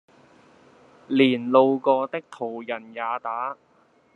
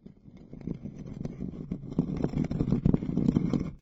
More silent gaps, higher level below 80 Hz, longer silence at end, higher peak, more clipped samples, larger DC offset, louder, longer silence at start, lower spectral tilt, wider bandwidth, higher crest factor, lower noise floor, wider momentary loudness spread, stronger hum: neither; second, -76 dBFS vs -44 dBFS; first, 0.6 s vs 0.05 s; first, -4 dBFS vs -10 dBFS; neither; neither; first, -23 LUFS vs -31 LUFS; first, 1.1 s vs 0.05 s; second, -7 dB/octave vs -10 dB/octave; second, 4.3 kHz vs 7.8 kHz; about the same, 20 dB vs 20 dB; first, -60 dBFS vs -51 dBFS; about the same, 14 LU vs 13 LU; neither